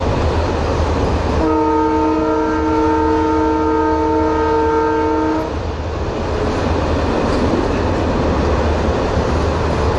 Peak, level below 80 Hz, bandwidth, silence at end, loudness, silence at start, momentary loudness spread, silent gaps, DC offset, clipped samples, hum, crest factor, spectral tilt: -4 dBFS; -26 dBFS; 10.5 kHz; 0 s; -17 LUFS; 0 s; 4 LU; none; under 0.1%; under 0.1%; none; 10 dB; -7 dB/octave